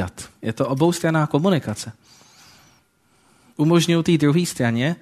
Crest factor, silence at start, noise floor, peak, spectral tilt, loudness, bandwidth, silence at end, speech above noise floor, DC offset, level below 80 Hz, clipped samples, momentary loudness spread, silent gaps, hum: 18 dB; 0 s; -60 dBFS; -4 dBFS; -6 dB/octave; -20 LUFS; 13.5 kHz; 0.05 s; 41 dB; under 0.1%; -56 dBFS; under 0.1%; 13 LU; none; none